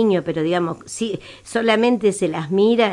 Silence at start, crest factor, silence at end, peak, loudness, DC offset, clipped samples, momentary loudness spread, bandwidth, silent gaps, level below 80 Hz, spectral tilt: 0 s; 16 dB; 0 s; -2 dBFS; -20 LUFS; under 0.1%; under 0.1%; 10 LU; 11.5 kHz; none; -60 dBFS; -5 dB/octave